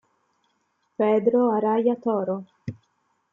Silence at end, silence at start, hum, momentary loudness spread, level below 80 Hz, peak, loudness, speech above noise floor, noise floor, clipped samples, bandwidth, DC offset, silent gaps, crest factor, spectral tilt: 0.6 s; 1 s; none; 19 LU; -72 dBFS; -8 dBFS; -23 LUFS; 50 dB; -71 dBFS; under 0.1%; 5.4 kHz; under 0.1%; none; 16 dB; -9.5 dB/octave